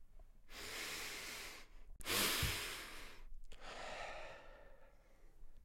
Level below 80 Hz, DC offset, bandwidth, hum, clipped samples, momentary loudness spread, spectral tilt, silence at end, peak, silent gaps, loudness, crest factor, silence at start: -56 dBFS; under 0.1%; 16.5 kHz; none; under 0.1%; 24 LU; -1.5 dB/octave; 0 s; -26 dBFS; none; -43 LUFS; 22 dB; 0 s